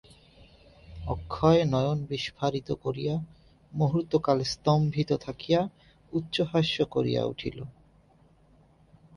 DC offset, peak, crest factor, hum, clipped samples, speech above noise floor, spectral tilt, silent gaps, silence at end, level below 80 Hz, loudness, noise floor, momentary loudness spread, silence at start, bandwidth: under 0.1%; -8 dBFS; 20 dB; none; under 0.1%; 33 dB; -7 dB/octave; none; 1.45 s; -52 dBFS; -28 LUFS; -60 dBFS; 13 LU; 0.9 s; 11 kHz